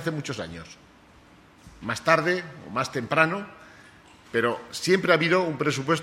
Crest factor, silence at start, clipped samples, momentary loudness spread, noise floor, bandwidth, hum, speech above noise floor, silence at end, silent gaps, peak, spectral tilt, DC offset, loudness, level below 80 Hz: 22 dB; 0 s; under 0.1%; 16 LU; -53 dBFS; 15.5 kHz; none; 28 dB; 0 s; none; -4 dBFS; -5 dB/octave; under 0.1%; -25 LUFS; -60 dBFS